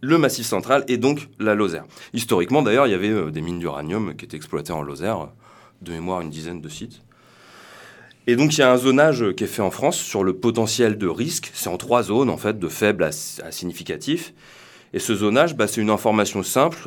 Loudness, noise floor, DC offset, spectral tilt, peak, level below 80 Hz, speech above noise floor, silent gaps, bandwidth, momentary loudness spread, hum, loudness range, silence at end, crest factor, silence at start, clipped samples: -21 LUFS; -49 dBFS; under 0.1%; -4.5 dB/octave; -2 dBFS; -56 dBFS; 29 dB; none; 19 kHz; 14 LU; none; 10 LU; 0 s; 20 dB; 0 s; under 0.1%